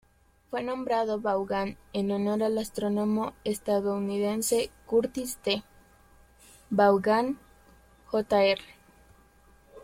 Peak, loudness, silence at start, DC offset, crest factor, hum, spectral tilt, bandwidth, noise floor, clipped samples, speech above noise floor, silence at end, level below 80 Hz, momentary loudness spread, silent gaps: -10 dBFS; -28 LUFS; 0.5 s; under 0.1%; 18 dB; none; -4.5 dB/octave; 16.5 kHz; -59 dBFS; under 0.1%; 32 dB; 0 s; -60 dBFS; 9 LU; none